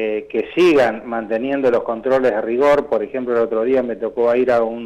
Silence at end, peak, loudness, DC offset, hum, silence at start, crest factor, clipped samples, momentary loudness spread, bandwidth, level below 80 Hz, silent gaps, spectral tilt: 0 s; -8 dBFS; -18 LUFS; under 0.1%; none; 0 s; 10 dB; under 0.1%; 7 LU; 11 kHz; -52 dBFS; none; -6 dB/octave